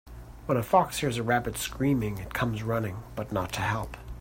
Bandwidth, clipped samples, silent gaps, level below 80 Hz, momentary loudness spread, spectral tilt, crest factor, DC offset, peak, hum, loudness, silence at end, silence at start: 16.5 kHz; under 0.1%; none; -46 dBFS; 12 LU; -5.5 dB/octave; 22 dB; under 0.1%; -8 dBFS; none; -29 LUFS; 0 s; 0.05 s